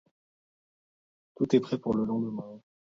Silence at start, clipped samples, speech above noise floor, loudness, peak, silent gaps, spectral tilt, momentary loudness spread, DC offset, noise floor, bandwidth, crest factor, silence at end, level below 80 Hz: 1.4 s; under 0.1%; over 62 dB; -29 LUFS; -10 dBFS; none; -8 dB/octave; 13 LU; under 0.1%; under -90 dBFS; 7.6 kHz; 22 dB; 0.3 s; -66 dBFS